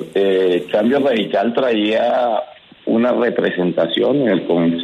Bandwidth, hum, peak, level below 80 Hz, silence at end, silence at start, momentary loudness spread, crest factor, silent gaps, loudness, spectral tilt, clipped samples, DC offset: 10.5 kHz; none; -4 dBFS; -64 dBFS; 0 s; 0 s; 4 LU; 12 dB; none; -16 LUFS; -7 dB/octave; under 0.1%; under 0.1%